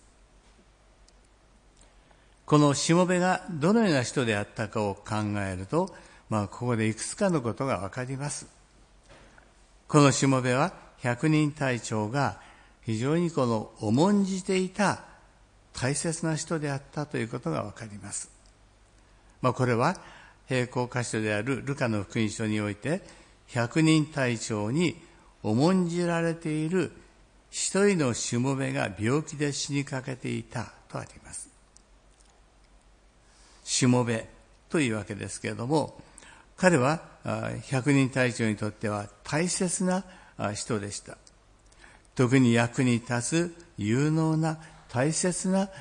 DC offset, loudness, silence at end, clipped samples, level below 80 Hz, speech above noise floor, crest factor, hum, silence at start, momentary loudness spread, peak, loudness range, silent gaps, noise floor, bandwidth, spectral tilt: under 0.1%; -27 LUFS; 0 s; under 0.1%; -60 dBFS; 32 dB; 22 dB; none; 2.5 s; 12 LU; -6 dBFS; 6 LU; none; -59 dBFS; 10.5 kHz; -5.5 dB/octave